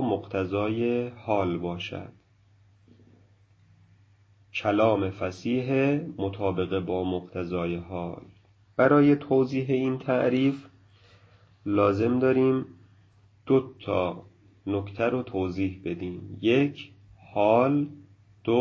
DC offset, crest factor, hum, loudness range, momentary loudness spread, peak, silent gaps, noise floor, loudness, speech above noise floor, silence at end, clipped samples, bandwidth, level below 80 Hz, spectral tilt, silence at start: under 0.1%; 20 dB; none; 6 LU; 13 LU; -8 dBFS; none; -60 dBFS; -26 LUFS; 35 dB; 0 s; under 0.1%; 7 kHz; -54 dBFS; -8 dB/octave; 0 s